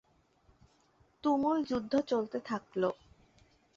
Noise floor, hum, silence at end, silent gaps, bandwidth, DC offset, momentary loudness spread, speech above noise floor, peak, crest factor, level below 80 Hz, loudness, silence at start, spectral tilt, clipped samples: -68 dBFS; none; 0.8 s; none; 7.6 kHz; under 0.1%; 8 LU; 37 dB; -18 dBFS; 18 dB; -68 dBFS; -33 LUFS; 1.25 s; -6.5 dB/octave; under 0.1%